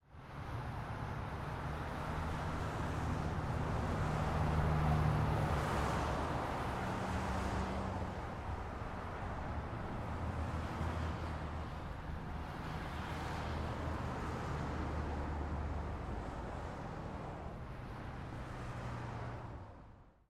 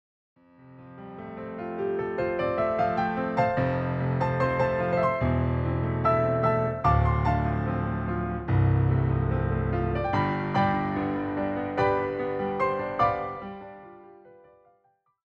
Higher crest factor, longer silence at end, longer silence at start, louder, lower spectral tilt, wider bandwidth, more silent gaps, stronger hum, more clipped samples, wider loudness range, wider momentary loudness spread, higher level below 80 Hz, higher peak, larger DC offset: about the same, 18 dB vs 18 dB; second, 0.2 s vs 1 s; second, 0.1 s vs 0.6 s; second, -40 LUFS vs -26 LUFS; second, -7 dB/octave vs -9.5 dB/octave; first, 14 kHz vs 6.6 kHz; neither; neither; neither; first, 9 LU vs 4 LU; about the same, 10 LU vs 11 LU; second, -46 dBFS vs -40 dBFS; second, -22 dBFS vs -10 dBFS; neither